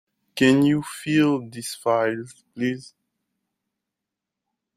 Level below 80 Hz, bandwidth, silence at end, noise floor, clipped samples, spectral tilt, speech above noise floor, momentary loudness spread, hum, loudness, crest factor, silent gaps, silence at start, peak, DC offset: -64 dBFS; 15 kHz; 1.95 s; -85 dBFS; under 0.1%; -5.5 dB/octave; 63 dB; 16 LU; none; -22 LUFS; 20 dB; none; 0.35 s; -4 dBFS; under 0.1%